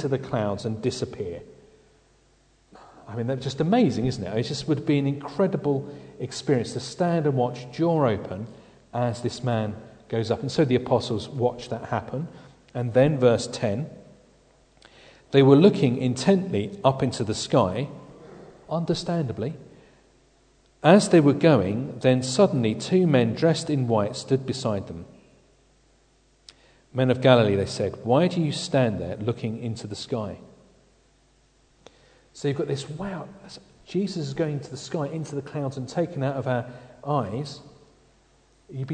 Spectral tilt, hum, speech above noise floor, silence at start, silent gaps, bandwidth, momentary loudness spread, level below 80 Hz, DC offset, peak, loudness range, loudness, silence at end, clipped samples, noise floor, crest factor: -6.5 dB/octave; none; 38 dB; 0 s; none; 9.4 kHz; 16 LU; -58 dBFS; under 0.1%; -2 dBFS; 10 LU; -24 LUFS; 0 s; under 0.1%; -61 dBFS; 24 dB